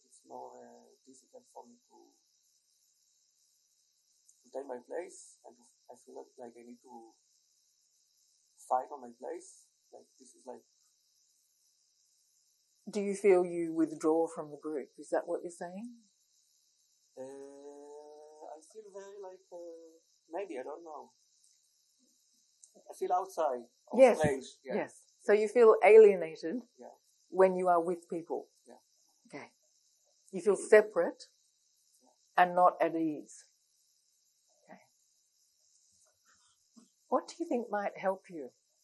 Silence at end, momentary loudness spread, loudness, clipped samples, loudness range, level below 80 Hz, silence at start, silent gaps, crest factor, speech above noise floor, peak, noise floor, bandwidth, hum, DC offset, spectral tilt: 0.35 s; 27 LU; -30 LUFS; under 0.1%; 23 LU; -76 dBFS; 0.3 s; none; 24 dB; 43 dB; -10 dBFS; -74 dBFS; 12 kHz; none; under 0.1%; -5.5 dB/octave